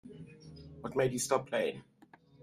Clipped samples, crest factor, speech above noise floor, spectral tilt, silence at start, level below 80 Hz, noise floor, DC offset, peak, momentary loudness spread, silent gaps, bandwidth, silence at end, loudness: under 0.1%; 22 dB; 29 dB; -4 dB/octave; 0.05 s; -66 dBFS; -62 dBFS; under 0.1%; -14 dBFS; 20 LU; none; 15.5 kHz; 0.6 s; -34 LUFS